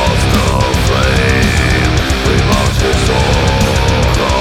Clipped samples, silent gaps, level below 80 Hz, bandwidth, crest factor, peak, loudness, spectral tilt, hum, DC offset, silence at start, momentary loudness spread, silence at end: under 0.1%; none; -16 dBFS; 16.5 kHz; 10 dB; 0 dBFS; -12 LUFS; -5 dB/octave; none; under 0.1%; 0 s; 2 LU; 0 s